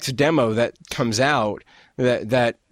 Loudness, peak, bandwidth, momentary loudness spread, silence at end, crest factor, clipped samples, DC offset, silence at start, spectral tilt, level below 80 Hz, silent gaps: -21 LUFS; -4 dBFS; 16 kHz; 7 LU; 0.2 s; 16 dB; under 0.1%; under 0.1%; 0 s; -5 dB/octave; -54 dBFS; none